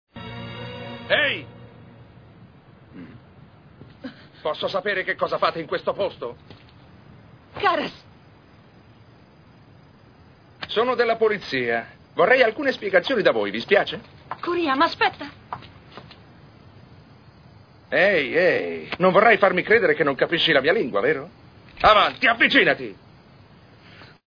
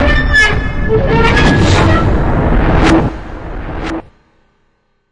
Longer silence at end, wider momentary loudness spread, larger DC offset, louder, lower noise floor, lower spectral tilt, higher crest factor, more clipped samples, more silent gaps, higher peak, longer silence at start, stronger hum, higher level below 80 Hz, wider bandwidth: second, 0.2 s vs 1.1 s; first, 21 LU vs 15 LU; neither; second, -20 LUFS vs -11 LUFS; second, -51 dBFS vs -58 dBFS; about the same, -6 dB/octave vs -6 dB/octave; first, 22 dB vs 12 dB; neither; neither; about the same, -2 dBFS vs 0 dBFS; first, 0.15 s vs 0 s; neither; second, -56 dBFS vs -18 dBFS; second, 5.4 kHz vs 11 kHz